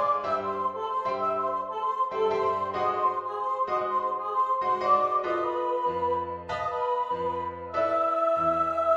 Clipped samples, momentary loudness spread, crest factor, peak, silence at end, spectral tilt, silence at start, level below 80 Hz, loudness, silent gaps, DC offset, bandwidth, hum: under 0.1%; 6 LU; 16 dB; -10 dBFS; 0 s; -6 dB/octave; 0 s; -62 dBFS; -27 LUFS; none; under 0.1%; 8 kHz; none